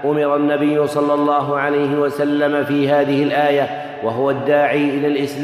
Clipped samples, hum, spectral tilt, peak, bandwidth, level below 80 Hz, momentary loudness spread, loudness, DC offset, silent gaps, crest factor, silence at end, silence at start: under 0.1%; none; -7 dB/octave; -4 dBFS; 14 kHz; -64 dBFS; 4 LU; -17 LUFS; under 0.1%; none; 14 dB; 0 s; 0 s